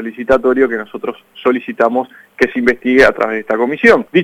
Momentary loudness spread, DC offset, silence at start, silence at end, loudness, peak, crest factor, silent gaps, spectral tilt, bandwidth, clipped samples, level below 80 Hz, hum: 12 LU; under 0.1%; 0 s; 0 s; -13 LUFS; 0 dBFS; 14 dB; none; -6 dB/octave; 13 kHz; under 0.1%; -42 dBFS; none